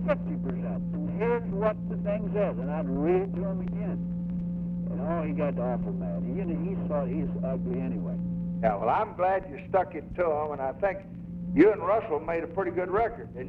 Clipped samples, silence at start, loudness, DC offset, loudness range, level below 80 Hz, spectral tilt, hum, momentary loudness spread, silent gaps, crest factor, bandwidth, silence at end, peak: under 0.1%; 0 s; -29 LUFS; under 0.1%; 3 LU; -48 dBFS; -11 dB/octave; none; 6 LU; none; 20 dB; 3.9 kHz; 0 s; -8 dBFS